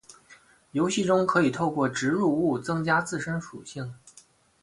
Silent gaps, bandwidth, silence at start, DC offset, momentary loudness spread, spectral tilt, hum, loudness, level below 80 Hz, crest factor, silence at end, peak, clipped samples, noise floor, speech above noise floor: none; 11.5 kHz; 0.1 s; under 0.1%; 15 LU; -5.5 dB/octave; none; -26 LUFS; -62 dBFS; 18 dB; 0.65 s; -10 dBFS; under 0.1%; -57 dBFS; 32 dB